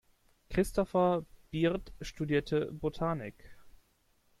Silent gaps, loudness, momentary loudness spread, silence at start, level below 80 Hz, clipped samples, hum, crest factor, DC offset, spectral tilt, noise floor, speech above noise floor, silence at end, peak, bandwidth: none; -33 LUFS; 11 LU; 0.5 s; -52 dBFS; under 0.1%; none; 18 dB; under 0.1%; -6.5 dB/octave; -71 dBFS; 39 dB; 0.7 s; -16 dBFS; 15.5 kHz